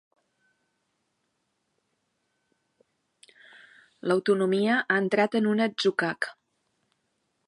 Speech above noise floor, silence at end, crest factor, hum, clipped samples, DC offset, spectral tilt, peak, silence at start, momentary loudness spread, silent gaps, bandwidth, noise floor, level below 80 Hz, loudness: 52 dB; 1.15 s; 20 dB; none; under 0.1%; under 0.1%; -5.5 dB/octave; -10 dBFS; 4.05 s; 8 LU; none; 11.5 kHz; -77 dBFS; -82 dBFS; -25 LUFS